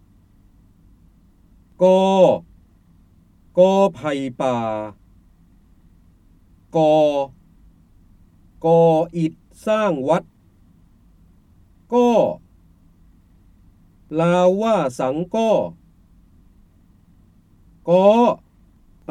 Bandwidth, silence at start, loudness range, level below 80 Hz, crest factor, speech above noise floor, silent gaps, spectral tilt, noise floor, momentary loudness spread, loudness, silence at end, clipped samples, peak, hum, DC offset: 11.5 kHz; 1.8 s; 5 LU; -54 dBFS; 18 dB; 36 dB; none; -7 dB/octave; -53 dBFS; 13 LU; -18 LUFS; 0.75 s; under 0.1%; -2 dBFS; none; under 0.1%